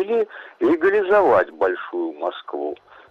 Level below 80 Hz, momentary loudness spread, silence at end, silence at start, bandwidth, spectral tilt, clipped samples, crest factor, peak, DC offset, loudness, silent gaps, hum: -58 dBFS; 13 LU; 0.35 s; 0 s; 6.4 kHz; -6.5 dB/octave; under 0.1%; 16 dB; -4 dBFS; under 0.1%; -21 LUFS; none; none